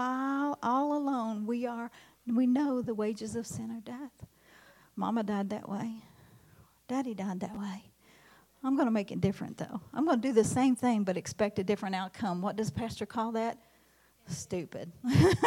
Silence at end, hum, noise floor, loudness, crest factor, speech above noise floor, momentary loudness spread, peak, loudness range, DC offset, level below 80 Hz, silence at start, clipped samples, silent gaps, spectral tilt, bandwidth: 0 s; none; -65 dBFS; -32 LUFS; 20 dB; 34 dB; 14 LU; -12 dBFS; 8 LU; under 0.1%; -64 dBFS; 0 s; under 0.1%; none; -6.5 dB/octave; 16 kHz